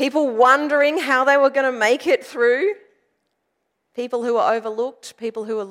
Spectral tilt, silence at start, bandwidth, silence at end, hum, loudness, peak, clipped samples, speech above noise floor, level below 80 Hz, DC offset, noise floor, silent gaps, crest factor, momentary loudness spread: -3 dB/octave; 0 s; 15 kHz; 0 s; none; -18 LUFS; -4 dBFS; under 0.1%; 55 dB; -80 dBFS; under 0.1%; -74 dBFS; none; 16 dB; 14 LU